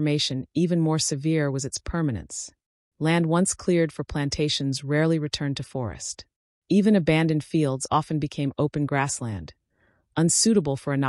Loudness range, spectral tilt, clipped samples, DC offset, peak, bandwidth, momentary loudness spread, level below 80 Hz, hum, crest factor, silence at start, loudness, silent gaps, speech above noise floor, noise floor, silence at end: 2 LU; -5 dB/octave; under 0.1%; under 0.1%; -8 dBFS; 12 kHz; 12 LU; -50 dBFS; none; 16 dB; 0 s; -24 LUFS; 2.66-2.92 s, 6.36-6.62 s; 43 dB; -67 dBFS; 0 s